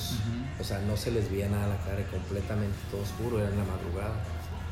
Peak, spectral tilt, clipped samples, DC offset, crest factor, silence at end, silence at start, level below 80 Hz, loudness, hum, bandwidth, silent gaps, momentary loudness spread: -18 dBFS; -6.5 dB/octave; under 0.1%; under 0.1%; 12 dB; 0 s; 0 s; -44 dBFS; -32 LUFS; none; 16 kHz; none; 5 LU